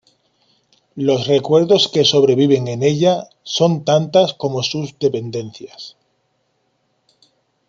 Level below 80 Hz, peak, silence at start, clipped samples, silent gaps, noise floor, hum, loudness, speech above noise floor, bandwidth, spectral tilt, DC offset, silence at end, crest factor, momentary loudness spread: -62 dBFS; -2 dBFS; 0.95 s; under 0.1%; none; -66 dBFS; none; -16 LUFS; 50 dB; 7.6 kHz; -5.5 dB/octave; under 0.1%; 1.8 s; 16 dB; 19 LU